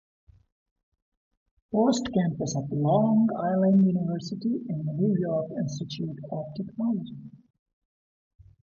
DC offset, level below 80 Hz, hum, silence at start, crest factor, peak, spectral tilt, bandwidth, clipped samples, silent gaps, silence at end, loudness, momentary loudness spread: under 0.1%; -62 dBFS; none; 1.7 s; 16 dB; -10 dBFS; -7.5 dB/octave; 7.6 kHz; under 0.1%; none; 1.3 s; -27 LUFS; 12 LU